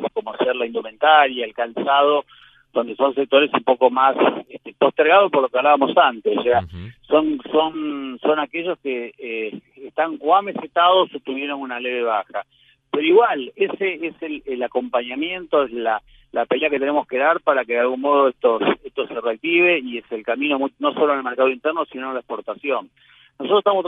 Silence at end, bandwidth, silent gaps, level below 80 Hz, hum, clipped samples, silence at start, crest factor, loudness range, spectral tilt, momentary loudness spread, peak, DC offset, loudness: 0 s; 4 kHz; none; -60 dBFS; none; under 0.1%; 0 s; 18 dB; 5 LU; -7.5 dB/octave; 12 LU; 0 dBFS; under 0.1%; -19 LUFS